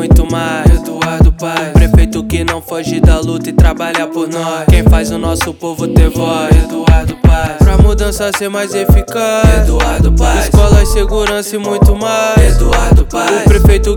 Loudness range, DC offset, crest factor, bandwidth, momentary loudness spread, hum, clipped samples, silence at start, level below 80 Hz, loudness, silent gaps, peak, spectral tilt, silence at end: 2 LU; under 0.1%; 8 dB; 18 kHz; 7 LU; none; 2%; 0 s; -12 dBFS; -11 LUFS; none; 0 dBFS; -6 dB/octave; 0 s